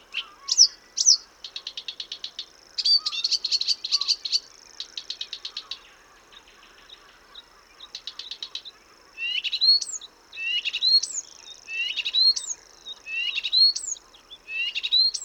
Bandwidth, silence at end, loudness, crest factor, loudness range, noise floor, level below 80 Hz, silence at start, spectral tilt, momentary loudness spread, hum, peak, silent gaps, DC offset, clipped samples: 19 kHz; 0 s; -22 LUFS; 24 dB; 17 LU; -53 dBFS; -68 dBFS; 0.1 s; 4.5 dB/octave; 19 LU; none; -2 dBFS; none; under 0.1%; under 0.1%